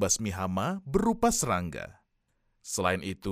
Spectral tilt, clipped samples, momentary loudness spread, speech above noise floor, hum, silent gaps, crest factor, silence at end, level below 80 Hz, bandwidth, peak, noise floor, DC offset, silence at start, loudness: -4 dB/octave; under 0.1%; 14 LU; 45 dB; none; none; 20 dB; 0 s; -50 dBFS; 16 kHz; -10 dBFS; -74 dBFS; under 0.1%; 0 s; -29 LUFS